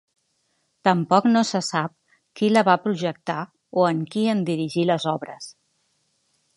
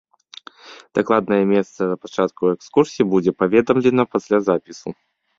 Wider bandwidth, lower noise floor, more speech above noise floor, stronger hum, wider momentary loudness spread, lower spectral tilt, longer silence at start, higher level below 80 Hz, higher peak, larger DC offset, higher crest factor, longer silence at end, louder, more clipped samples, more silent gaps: first, 11.5 kHz vs 7.6 kHz; first, -70 dBFS vs -43 dBFS; first, 49 dB vs 25 dB; neither; first, 12 LU vs 8 LU; second, -5.5 dB/octave vs -7 dB/octave; first, 0.85 s vs 0.65 s; second, -72 dBFS vs -58 dBFS; about the same, -2 dBFS vs -2 dBFS; neither; about the same, 22 dB vs 18 dB; first, 1.05 s vs 0.45 s; second, -22 LUFS vs -19 LUFS; neither; neither